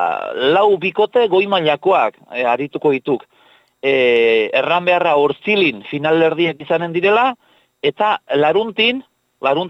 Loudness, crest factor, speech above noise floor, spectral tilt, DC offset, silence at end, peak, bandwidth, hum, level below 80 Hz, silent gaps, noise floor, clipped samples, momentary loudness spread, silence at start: -16 LUFS; 14 dB; 37 dB; -6.5 dB/octave; under 0.1%; 0 s; -2 dBFS; 7.8 kHz; none; -64 dBFS; none; -53 dBFS; under 0.1%; 7 LU; 0 s